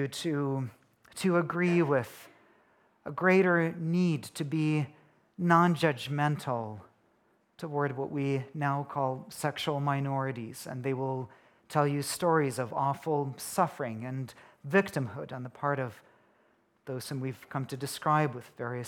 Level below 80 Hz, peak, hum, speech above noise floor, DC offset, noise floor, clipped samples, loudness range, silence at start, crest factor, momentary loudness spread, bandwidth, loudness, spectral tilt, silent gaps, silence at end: -76 dBFS; -8 dBFS; none; 39 dB; under 0.1%; -69 dBFS; under 0.1%; 6 LU; 0 s; 22 dB; 14 LU; 17.5 kHz; -31 LUFS; -6 dB/octave; none; 0 s